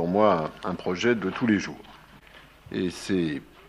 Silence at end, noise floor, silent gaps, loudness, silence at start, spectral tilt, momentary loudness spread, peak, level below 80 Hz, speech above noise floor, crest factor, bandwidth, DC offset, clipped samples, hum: 0.25 s; -51 dBFS; none; -26 LUFS; 0 s; -6 dB/octave; 11 LU; -8 dBFS; -58 dBFS; 25 dB; 20 dB; 12.5 kHz; under 0.1%; under 0.1%; none